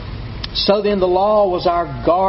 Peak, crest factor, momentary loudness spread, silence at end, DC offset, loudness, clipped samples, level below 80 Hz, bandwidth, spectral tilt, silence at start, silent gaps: -2 dBFS; 16 dB; 10 LU; 0 s; under 0.1%; -16 LUFS; under 0.1%; -34 dBFS; 6 kHz; -4 dB/octave; 0 s; none